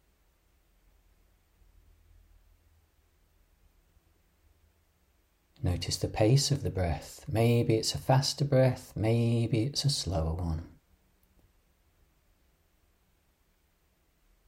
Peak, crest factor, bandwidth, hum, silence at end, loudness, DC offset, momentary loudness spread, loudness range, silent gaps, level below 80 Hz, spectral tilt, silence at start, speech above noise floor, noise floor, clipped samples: -12 dBFS; 20 dB; 16 kHz; none; 3.8 s; -29 LUFS; under 0.1%; 9 LU; 12 LU; none; -50 dBFS; -5.5 dB/octave; 5.6 s; 42 dB; -70 dBFS; under 0.1%